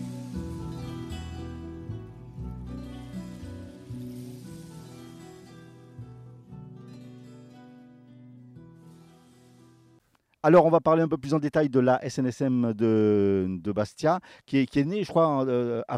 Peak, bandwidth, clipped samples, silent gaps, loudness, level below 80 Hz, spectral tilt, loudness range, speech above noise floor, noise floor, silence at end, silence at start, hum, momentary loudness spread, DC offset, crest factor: -8 dBFS; 13.5 kHz; under 0.1%; none; -25 LUFS; -54 dBFS; -7.5 dB/octave; 24 LU; 41 dB; -64 dBFS; 0 s; 0 s; none; 24 LU; under 0.1%; 20 dB